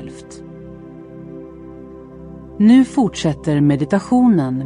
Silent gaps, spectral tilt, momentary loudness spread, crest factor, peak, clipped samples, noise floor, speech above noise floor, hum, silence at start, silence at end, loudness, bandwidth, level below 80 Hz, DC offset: none; -7 dB/octave; 24 LU; 14 dB; -2 dBFS; under 0.1%; -36 dBFS; 21 dB; none; 0 s; 0 s; -15 LUFS; 10.5 kHz; -46 dBFS; under 0.1%